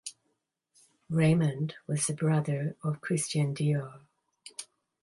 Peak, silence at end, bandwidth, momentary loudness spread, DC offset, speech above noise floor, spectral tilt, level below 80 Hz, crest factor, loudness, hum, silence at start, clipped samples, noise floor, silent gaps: -14 dBFS; 0.4 s; 11.5 kHz; 18 LU; under 0.1%; 50 dB; -6 dB/octave; -66 dBFS; 16 dB; -29 LUFS; none; 0.05 s; under 0.1%; -79 dBFS; none